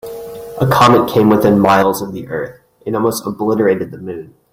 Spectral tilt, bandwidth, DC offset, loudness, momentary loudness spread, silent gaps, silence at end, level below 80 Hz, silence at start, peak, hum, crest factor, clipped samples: -6 dB/octave; 16.5 kHz; under 0.1%; -13 LUFS; 19 LU; none; 0.25 s; -48 dBFS; 0.05 s; 0 dBFS; none; 14 dB; under 0.1%